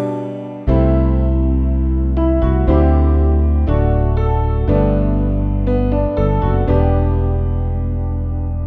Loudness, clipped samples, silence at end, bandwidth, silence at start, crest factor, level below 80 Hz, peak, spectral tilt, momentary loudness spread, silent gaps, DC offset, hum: -16 LUFS; under 0.1%; 0 s; 3.8 kHz; 0 s; 14 dB; -18 dBFS; -2 dBFS; -11.5 dB/octave; 7 LU; none; under 0.1%; none